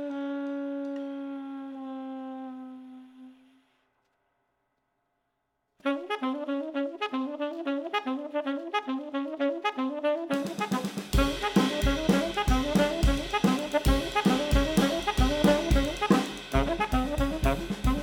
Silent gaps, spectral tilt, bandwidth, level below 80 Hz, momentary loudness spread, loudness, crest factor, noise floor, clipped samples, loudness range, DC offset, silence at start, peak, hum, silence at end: none; -5.5 dB/octave; 19 kHz; -36 dBFS; 13 LU; -28 LUFS; 20 dB; -79 dBFS; under 0.1%; 15 LU; under 0.1%; 0 s; -8 dBFS; none; 0 s